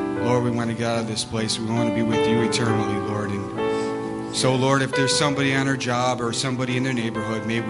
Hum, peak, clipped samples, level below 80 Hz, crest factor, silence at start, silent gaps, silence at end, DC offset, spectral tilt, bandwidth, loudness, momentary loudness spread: none; -4 dBFS; under 0.1%; -54 dBFS; 18 dB; 0 s; none; 0 s; under 0.1%; -4.5 dB/octave; 11.5 kHz; -22 LUFS; 6 LU